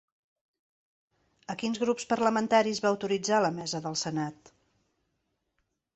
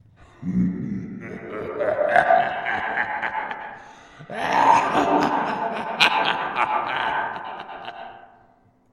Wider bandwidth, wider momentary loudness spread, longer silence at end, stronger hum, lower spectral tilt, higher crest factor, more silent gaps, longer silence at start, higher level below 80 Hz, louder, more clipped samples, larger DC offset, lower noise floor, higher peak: second, 8.4 kHz vs 15 kHz; second, 10 LU vs 18 LU; first, 1.65 s vs 0.7 s; neither; about the same, -4 dB/octave vs -5 dB/octave; about the same, 22 dB vs 24 dB; neither; first, 1.5 s vs 0.2 s; second, -72 dBFS vs -56 dBFS; second, -28 LUFS vs -22 LUFS; neither; neither; first, -79 dBFS vs -58 dBFS; second, -10 dBFS vs 0 dBFS